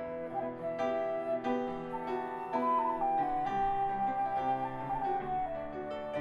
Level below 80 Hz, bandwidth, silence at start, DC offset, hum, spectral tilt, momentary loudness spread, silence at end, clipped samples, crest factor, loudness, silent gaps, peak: -58 dBFS; 6.8 kHz; 0 s; under 0.1%; none; -7 dB/octave; 7 LU; 0 s; under 0.1%; 12 dB; -34 LUFS; none; -20 dBFS